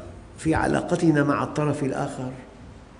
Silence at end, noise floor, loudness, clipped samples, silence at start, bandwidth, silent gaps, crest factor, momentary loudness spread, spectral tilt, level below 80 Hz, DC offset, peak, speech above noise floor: 0 s; -44 dBFS; -24 LUFS; under 0.1%; 0 s; 10.5 kHz; none; 18 dB; 19 LU; -6.5 dB/octave; -46 dBFS; under 0.1%; -8 dBFS; 21 dB